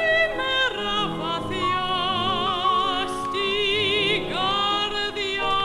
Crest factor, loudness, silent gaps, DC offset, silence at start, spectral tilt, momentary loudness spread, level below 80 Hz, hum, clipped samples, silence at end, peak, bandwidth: 14 dB; -22 LUFS; none; under 0.1%; 0 s; -3.5 dB/octave; 5 LU; -46 dBFS; none; under 0.1%; 0 s; -10 dBFS; 14.5 kHz